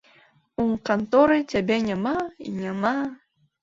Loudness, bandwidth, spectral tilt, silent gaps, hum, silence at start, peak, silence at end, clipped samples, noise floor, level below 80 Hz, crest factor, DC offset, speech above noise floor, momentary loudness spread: -24 LUFS; 7.6 kHz; -6.5 dB/octave; none; none; 0.6 s; -6 dBFS; 0.5 s; under 0.1%; -58 dBFS; -56 dBFS; 18 dB; under 0.1%; 35 dB; 13 LU